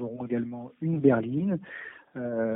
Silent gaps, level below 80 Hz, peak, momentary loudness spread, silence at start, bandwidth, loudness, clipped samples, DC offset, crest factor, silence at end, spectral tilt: none; -68 dBFS; -8 dBFS; 17 LU; 0 s; 3.8 kHz; -28 LUFS; under 0.1%; under 0.1%; 20 dB; 0 s; -12.5 dB/octave